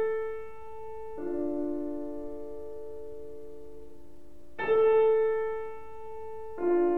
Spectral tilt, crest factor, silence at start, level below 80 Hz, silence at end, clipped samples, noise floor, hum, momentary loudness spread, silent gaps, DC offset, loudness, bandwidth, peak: -7.5 dB/octave; 16 dB; 0 s; -58 dBFS; 0 s; under 0.1%; -54 dBFS; none; 22 LU; none; 1%; -30 LUFS; 3.8 kHz; -16 dBFS